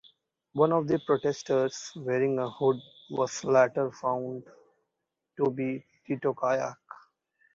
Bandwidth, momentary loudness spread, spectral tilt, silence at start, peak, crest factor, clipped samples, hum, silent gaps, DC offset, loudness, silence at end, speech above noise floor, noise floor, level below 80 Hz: 7.8 kHz; 13 LU; -6 dB/octave; 0.55 s; -8 dBFS; 20 dB; under 0.1%; none; none; under 0.1%; -29 LUFS; 0.6 s; 57 dB; -84 dBFS; -72 dBFS